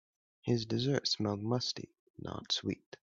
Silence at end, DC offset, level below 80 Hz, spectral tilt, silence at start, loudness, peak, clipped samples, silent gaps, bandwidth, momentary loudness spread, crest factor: 0.4 s; under 0.1%; -68 dBFS; -5 dB/octave; 0.45 s; -35 LUFS; -16 dBFS; under 0.1%; 1.99-2.14 s; 7.8 kHz; 13 LU; 20 dB